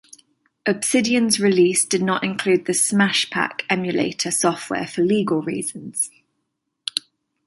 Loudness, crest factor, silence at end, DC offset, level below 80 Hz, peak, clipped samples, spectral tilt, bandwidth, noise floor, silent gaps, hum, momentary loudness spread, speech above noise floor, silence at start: -20 LUFS; 20 dB; 0.45 s; under 0.1%; -64 dBFS; -2 dBFS; under 0.1%; -3.5 dB/octave; 12 kHz; -76 dBFS; none; none; 10 LU; 56 dB; 0.65 s